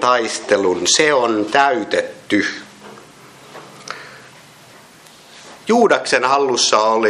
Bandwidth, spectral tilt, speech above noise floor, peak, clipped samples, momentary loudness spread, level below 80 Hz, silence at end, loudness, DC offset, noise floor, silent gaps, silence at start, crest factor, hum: 13 kHz; -2 dB/octave; 28 dB; 0 dBFS; under 0.1%; 19 LU; -66 dBFS; 0 s; -15 LUFS; under 0.1%; -44 dBFS; none; 0 s; 18 dB; none